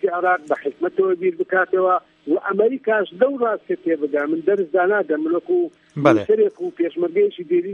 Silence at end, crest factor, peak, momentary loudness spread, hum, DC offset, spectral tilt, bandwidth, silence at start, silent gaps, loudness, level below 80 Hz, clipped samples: 0 s; 20 dB; 0 dBFS; 5 LU; none; under 0.1%; -7.5 dB/octave; 6.8 kHz; 0.05 s; none; -20 LUFS; -70 dBFS; under 0.1%